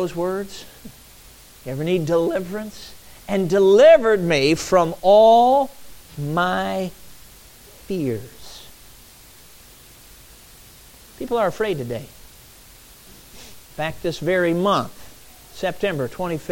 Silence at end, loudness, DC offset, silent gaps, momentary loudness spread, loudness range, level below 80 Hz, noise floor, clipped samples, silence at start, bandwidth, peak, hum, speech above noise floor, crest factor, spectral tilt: 0 s; -19 LUFS; under 0.1%; none; 27 LU; 18 LU; -50 dBFS; -46 dBFS; under 0.1%; 0 s; 17 kHz; -4 dBFS; none; 28 dB; 18 dB; -5.5 dB/octave